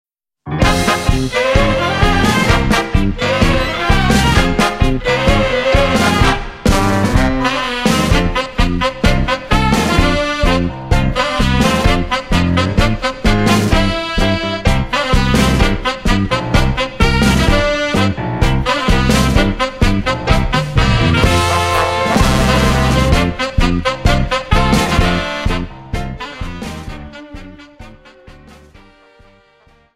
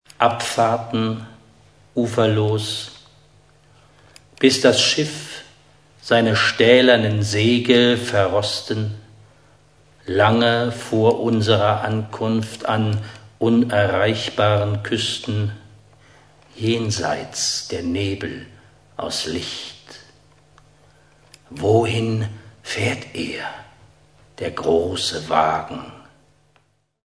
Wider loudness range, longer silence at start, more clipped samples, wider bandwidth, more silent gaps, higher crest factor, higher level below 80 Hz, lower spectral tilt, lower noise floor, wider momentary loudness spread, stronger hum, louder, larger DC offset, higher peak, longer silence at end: second, 4 LU vs 8 LU; first, 0.45 s vs 0.2 s; neither; first, 16 kHz vs 11 kHz; neither; second, 14 dB vs 20 dB; first, -20 dBFS vs -56 dBFS; about the same, -5 dB/octave vs -4.5 dB/octave; second, -50 dBFS vs -62 dBFS; second, 5 LU vs 17 LU; neither; first, -14 LUFS vs -19 LUFS; neither; about the same, 0 dBFS vs 0 dBFS; first, 1.65 s vs 1.05 s